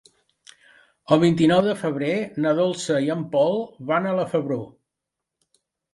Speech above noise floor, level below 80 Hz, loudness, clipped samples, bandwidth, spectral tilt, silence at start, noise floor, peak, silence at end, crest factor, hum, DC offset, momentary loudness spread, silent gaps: 63 dB; -62 dBFS; -22 LUFS; under 0.1%; 11.5 kHz; -6.5 dB/octave; 1.1 s; -84 dBFS; -2 dBFS; 1.25 s; 22 dB; none; under 0.1%; 8 LU; none